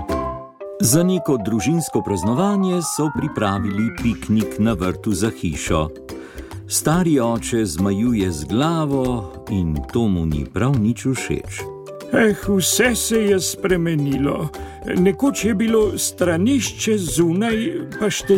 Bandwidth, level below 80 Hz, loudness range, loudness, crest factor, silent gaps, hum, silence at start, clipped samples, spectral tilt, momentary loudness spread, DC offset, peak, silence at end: 17 kHz; -38 dBFS; 3 LU; -19 LUFS; 16 dB; none; none; 0 s; under 0.1%; -5 dB/octave; 9 LU; under 0.1%; -4 dBFS; 0 s